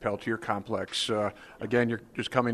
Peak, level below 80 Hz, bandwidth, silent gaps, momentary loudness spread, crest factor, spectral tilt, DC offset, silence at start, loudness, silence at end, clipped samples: -8 dBFS; -62 dBFS; 13 kHz; none; 6 LU; 20 dB; -5 dB/octave; under 0.1%; 0 s; -30 LUFS; 0 s; under 0.1%